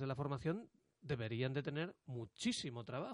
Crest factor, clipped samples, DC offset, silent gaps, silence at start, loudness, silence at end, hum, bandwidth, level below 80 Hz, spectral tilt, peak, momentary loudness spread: 16 dB; under 0.1%; under 0.1%; none; 0 s; -43 LUFS; 0 s; none; 11.5 kHz; -70 dBFS; -5.5 dB/octave; -26 dBFS; 9 LU